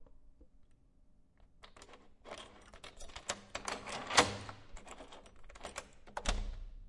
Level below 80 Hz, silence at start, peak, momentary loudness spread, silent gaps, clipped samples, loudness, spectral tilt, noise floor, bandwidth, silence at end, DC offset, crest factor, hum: -50 dBFS; 0 s; -8 dBFS; 27 LU; none; under 0.1%; -37 LUFS; -2 dB/octave; -64 dBFS; 11.5 kHz; 0 s; under 0.1%; 34 dB; none